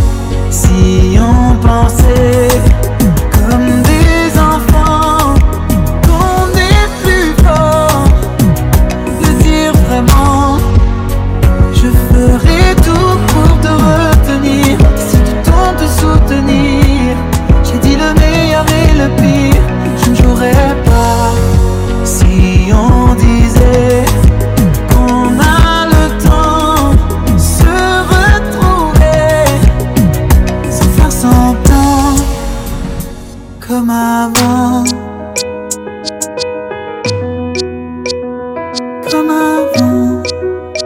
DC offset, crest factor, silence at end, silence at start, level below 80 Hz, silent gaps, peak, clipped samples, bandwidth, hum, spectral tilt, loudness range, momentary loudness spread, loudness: under 0.1%; 8 dB; 0 s; 0 s; -12 dBFS; none; 0 dBFS; 4%; 16.5 kHz; none; -6 dB/octave; 5 LU; 10 LU; -9 LUFS